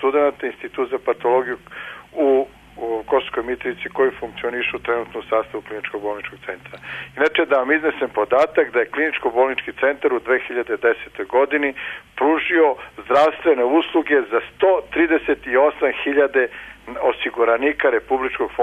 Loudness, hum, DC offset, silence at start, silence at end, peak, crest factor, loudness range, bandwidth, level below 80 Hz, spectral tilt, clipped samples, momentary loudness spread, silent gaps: -20 LUFS; none; under 0.1%; 0 s; 0 s; -6 dBFS; 14 dB; 5 LU; 9.4 kHz; -54 dBFS; -5.5 dB/octave; under 0.1%; 13 LU; none